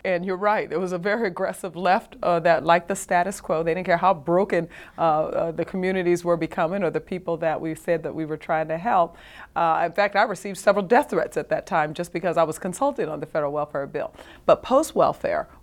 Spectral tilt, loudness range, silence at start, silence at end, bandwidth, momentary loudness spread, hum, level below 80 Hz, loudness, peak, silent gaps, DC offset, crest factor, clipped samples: -5.5 dB/octave; 3 LU; 0.05 s; 0.15 s; 16.5 kHz; 8 LU; none; -56 dBFS; -23 LUFS; -4 dBFS; none; under 0.1%; 20 dB; under 0.1%